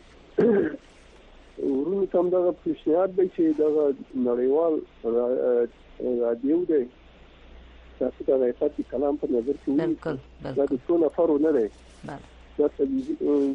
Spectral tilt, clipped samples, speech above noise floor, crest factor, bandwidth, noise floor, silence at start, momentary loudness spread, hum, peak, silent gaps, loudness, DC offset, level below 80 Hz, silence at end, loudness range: -9 dB/octave; under 0.1%; 27 dB; 14 dB; 6.8 kHz; -51 dBFS; 0.35 s; 10 LU; none; -10 dBFS; none; -25 LUFS; under 0.1%; -54 dBFS; 0 s; 3 LU